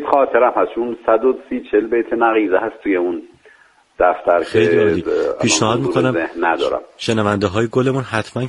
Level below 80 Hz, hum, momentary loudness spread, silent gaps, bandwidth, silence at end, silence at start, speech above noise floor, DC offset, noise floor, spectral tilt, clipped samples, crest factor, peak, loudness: -50 dBFS; none; 6 LU; none; 11.5 kHz; 0 s; 0 s; 34 dB; under 0.1%; -51 dBFS; -5 dB/octave; under 0.1%; 16 dB; 0 dBFS; -17 LUFS